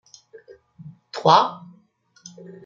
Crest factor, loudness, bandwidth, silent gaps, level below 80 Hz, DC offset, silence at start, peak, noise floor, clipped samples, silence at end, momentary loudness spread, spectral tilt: 22 dB; -18 LUFS; 7.4 kHz; none; -72 dBFS; under 0.1%; 0.85 s; -2 dBFS; -59 dBFS; under 0.1%; 1.1 s; 26 LU; -4.5 dB/octave